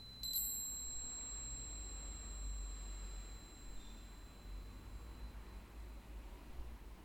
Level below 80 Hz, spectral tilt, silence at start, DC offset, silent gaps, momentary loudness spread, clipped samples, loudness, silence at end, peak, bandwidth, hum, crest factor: -52 dBFS; -2 dB/octave; 0 s; under 0.1%; none; 15 LU; under 0.1%; -47 LUFS; 0 s; -28 dBFS; 17.5 kHz; none; 20 dB